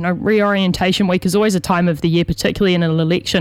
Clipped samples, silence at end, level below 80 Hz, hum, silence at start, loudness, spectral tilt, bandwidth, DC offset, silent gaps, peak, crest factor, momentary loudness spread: under 0.1%; 0 s; -40 dBFS; none; 0 s; -16 LUFS; -5.5 dB/octave; 16 kHz; under 0.1%; none; -2 dBFS; 14 dB; 2 LU